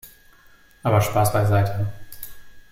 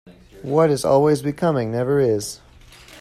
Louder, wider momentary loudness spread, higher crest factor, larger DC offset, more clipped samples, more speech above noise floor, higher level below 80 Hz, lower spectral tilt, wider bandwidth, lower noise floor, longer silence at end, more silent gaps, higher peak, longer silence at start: about the same, -21 LUFS vs -19 LUFS; first, 20 LU vs 14 LU; about the same, 16 dB vs 16 dB; neither; neither; first, 33 dB vs 26 dB; about the same, -48 dBFS vs -52 dBFS; about the same, -6 dB/octave vs -6.5 dB/octave; first, 16.5 kHz vs 14.5 kHz; first, -52 dBFS vs -46 dBFS; about the same, 0.1 s vs 0 s; neither; about the same, -6 dBFS vs -4 dBFS; about the same, 0.05 s vs 0.05 s